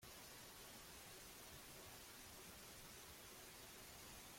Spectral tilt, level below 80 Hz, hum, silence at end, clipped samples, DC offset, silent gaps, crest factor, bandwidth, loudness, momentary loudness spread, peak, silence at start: -2 dB/octave; -72 dBFS; none; 0 s; under 0.1%; under 0.1%; none; 14 dB; 16.5 kHz; -57 LUFS; 0 LU; -46 dBFS; 0 s